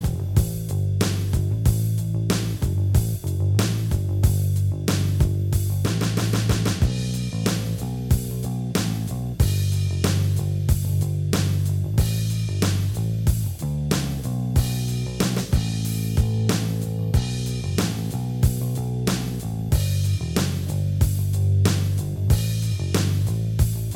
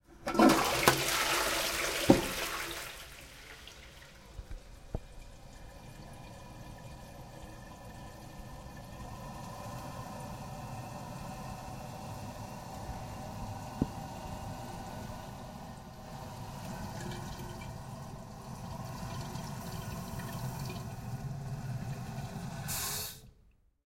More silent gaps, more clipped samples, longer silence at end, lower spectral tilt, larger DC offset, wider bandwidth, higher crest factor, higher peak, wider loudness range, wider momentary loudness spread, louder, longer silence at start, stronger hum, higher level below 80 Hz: neither; neither; second, 0 s vs 0.35 s; first, -6 dB/octave vs -4 dB/octave; neither; about the same, 17.5 kHz vs 16.5 kHz; second, 20 dB vs 34 dB; about the same, -2 dBFS vs -4 dBFS; second, 2 LU vs 17 LU; second, 4 LU vs 21 LU; first, -23 LUFS vs -36 LUFS; about the same, 0 s vs 0.1 s; neither; first, -32 dBFS vs -52 dBFS